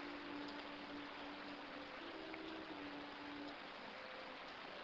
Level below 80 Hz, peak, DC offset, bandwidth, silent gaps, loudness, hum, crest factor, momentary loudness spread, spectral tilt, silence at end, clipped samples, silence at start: -76 dBFS; -32 dBFS; under 0.1%; 8 kHz; none; -51 LUFS; none; 18 dB; 2 LU; -1.5 dB/octave; 0 s; under 0.1%; 0 s